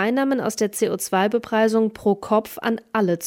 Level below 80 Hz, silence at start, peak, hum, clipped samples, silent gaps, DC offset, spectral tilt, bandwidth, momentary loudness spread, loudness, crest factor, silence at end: -60 dBFS; 0 s; -6 dBFS; none; under 0.1%; none; under 0.1%; -5 dB/octave; 17 kHz; 4 LU; -21 LUFS; 14 dB; 0 s